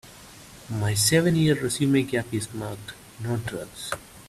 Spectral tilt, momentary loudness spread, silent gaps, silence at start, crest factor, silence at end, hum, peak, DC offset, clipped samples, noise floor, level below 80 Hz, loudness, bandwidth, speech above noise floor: -4.5 dB/octave; 22 LU; none; 0.05 s; 20 dB; 0 s; none; -6 dBFS; under 0.1%; under 0.1%; -46 dBFS; -54 dBFS; -25 LUFS; 15.5 kHz; 22 dB